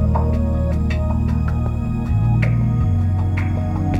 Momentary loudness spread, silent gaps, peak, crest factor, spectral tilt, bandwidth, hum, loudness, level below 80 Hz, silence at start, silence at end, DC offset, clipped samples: 4 LU; none; -4 dBFS; 12 dB; -9.5 dB/octave; 7.8 kHz; 60 Hz at -40 dBFS; -19 LUFS; -24 dBFS; 0 s; 0 s; under 0.1%; under 0.1%